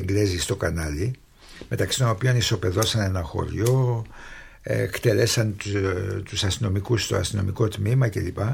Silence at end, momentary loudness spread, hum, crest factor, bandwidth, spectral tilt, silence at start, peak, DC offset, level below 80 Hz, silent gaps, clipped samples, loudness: 0 s; 9 LU; none; 16 dB; 17 kHz; -5 dB/octave; 0 s; -6 dBFS; under 0.1%; -42 dBFS; none; under 0.1%; -24 LUFS